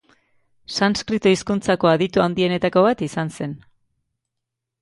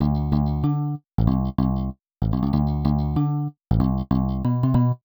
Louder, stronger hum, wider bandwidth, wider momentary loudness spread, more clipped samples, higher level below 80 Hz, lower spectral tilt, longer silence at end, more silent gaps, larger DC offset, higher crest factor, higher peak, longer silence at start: first, -19 LUFS vs -23 LUFS; neither; second, 11.5 kHz vs over 20 kHz; first, 11 LU vs 6 LU; neither; second, -54 dBFS vs -30 dBFS; second, -5.5 dB/octave vs -11.5 dB/octave; first, 1.25 s vs 0.1 s; neither; neither; about the same, 18 dB vs 16 dB; about the same, -4 dBFS vs -6 dBFS; first, 0.7 s vs 0 s